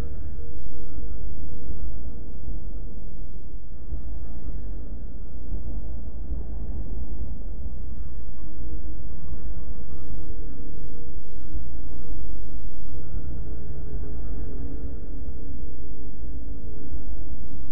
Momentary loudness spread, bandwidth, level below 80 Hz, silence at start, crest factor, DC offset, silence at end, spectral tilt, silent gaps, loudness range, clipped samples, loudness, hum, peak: 5 LU; 2.1 kHz; -36 dBFS; 0 s; 10 dB; 20%; 0 s; -12 dB/octave; none; 3 LU; under 0.1%; -39 LUFS; none; -8 dBFS